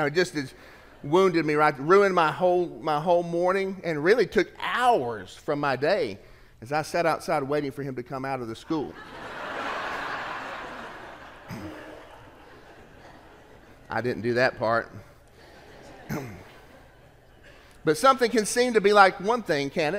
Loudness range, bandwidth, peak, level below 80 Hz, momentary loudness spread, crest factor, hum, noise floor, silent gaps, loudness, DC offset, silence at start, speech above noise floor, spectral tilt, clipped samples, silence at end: 13 LU; 16 kHz; -2 dBFS; -58 dBFS; 20 LU; 24 dB; none; -54 dBFS; none; -25 LUFS; under 0.1%; 0 s; 29 dB; -5 dB/octave; under 0.1%; 0 s